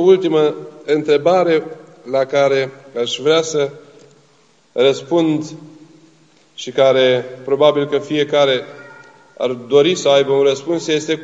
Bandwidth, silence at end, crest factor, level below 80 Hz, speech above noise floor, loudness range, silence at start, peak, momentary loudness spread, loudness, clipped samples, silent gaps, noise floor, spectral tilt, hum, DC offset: 8 kHz; 0 s; 16 dB; -72 dBFS; 39 dB; 3 LU; 0 s; 0 dBFS; 11 LU; -16 LUFS; under 0.1%; none; -54 dBFS; -4.5 dB/octave; none; 0.1%